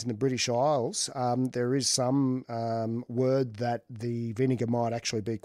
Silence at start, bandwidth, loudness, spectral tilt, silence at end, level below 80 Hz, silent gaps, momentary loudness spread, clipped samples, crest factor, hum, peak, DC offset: 0 s; 15 kHz; -29 LUFS; -5 dB/octave; 0.05 s; -70 dBFS; none; 7 LU; under 0.1%; 16 dB; none; -14 dBFS; under 0.1%